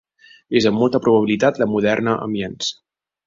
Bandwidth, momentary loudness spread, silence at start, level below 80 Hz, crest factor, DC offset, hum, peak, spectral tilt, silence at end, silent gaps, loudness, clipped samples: 7.6 kHz; 9 LU; 0.5 s; -56 dBFS; 18 dB; under 0.1%; none; -2 dBFS; -5.5 dB/octave; 0.55 s; none; -18 LUFS; under 0.1%